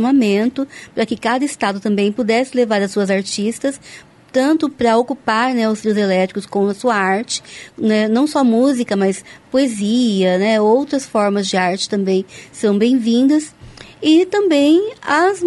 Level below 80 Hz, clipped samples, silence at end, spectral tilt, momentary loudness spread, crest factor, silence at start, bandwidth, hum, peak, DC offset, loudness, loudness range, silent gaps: -58 dBFS; under 0.1%; 0 s; -5 dB/octave; 7 LU; 12 dB; 0 s; 11.5 kHz; none; -4 dBFS; under 0.1%; -16 LUFS; 2 LU; none